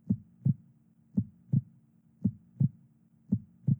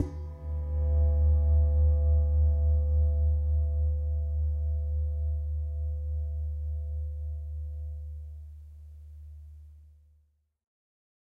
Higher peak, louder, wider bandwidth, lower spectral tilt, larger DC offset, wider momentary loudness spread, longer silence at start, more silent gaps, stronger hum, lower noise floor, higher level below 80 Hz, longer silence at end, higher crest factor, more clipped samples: about the same, -16 dBFS vs -14 dBFS; second, -34 LUFS vs -29 LUFS; second, 1 kHz vs 1.2 kHz; first, -14.5 dB/octave vs -11.5 dB/octave; neither; second, 3 LU vs 22 LU; about the same, 0.05 s vs 0 s; neither; neither; second, -63 dBFS vs -68 dBFS; second, -64 dBFS vs -28 dBFS; second, 0.05 s vs 1.4 s; about the same, 18 dB vs 14 dB; neither